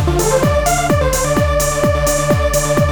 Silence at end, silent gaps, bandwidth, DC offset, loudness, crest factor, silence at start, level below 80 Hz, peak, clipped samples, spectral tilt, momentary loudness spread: 0 s; none; over 20 kHz; under 0.1%; -14 LUFS; 12 dB; 0 s; -24 dBFS; -2 dBFS; under 0.1%; -4.5 dB/octave; 1 LU